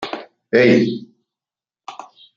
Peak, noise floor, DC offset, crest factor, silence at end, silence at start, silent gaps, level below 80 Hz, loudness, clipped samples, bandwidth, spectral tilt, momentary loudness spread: -2 dBFS; under -90 dBFS; under 0.1%; 18 dB; 0.35 s; 0 s; none; -62 dBFS; -15 LUFS; under 0.1%; 7.4 kHz; -6.5 dB/octave; 24 LU